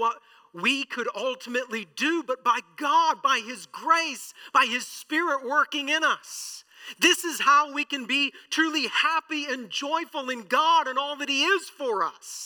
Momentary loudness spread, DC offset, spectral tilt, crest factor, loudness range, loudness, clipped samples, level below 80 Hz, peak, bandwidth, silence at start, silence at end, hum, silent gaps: 10 LU; under 0.1%; -1 dB/octave; 20 dB; 2 LU; -25 LUFS; under 0.1%; -88 dBFS; -6 dBFS; 19 kHz; 0 s; 0 s; none; none